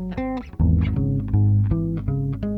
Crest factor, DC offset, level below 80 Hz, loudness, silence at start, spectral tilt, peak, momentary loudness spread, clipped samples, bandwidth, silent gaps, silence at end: 14 dB; under 0.1%; -30 dBFS; -22 LUFS; 0 s; -11 dB/octave; -8 dBFS; 8 LU; under 0.1%; 4.2 kHz; none; 0 s